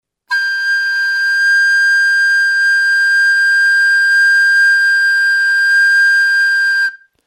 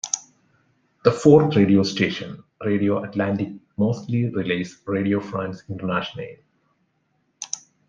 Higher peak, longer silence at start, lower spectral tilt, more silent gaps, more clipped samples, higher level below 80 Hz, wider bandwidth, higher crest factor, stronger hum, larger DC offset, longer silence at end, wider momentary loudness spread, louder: second, -6 dBFS vs -2 dBFS; first, 0.3 s vs 0.05 s; second, 7.5 dB/octave vs -5.5 dB/octave; neither; neither; second, -84 dBFS vs -62 dBFS; first, 15.5 kHz vs 9.2 kHz; second, 6 dB vs 20 dB; neither; neither; about the same, 0.3 s vs 0.3 s; second, 5 LU vs 16 LU; first, -10 LUFS vs -22 LUFS